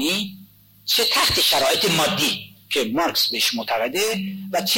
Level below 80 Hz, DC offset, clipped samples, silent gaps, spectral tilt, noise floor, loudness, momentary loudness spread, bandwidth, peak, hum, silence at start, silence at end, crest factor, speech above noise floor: -52 dBFS; under 0.1%; under 0.1%; none; -2 dB/octave; -48 dBFS; -19 LUFS; 10 LU; 17 kHz; -10 dBFS; none; 0 s; 0 s; 12 dB; 27 dB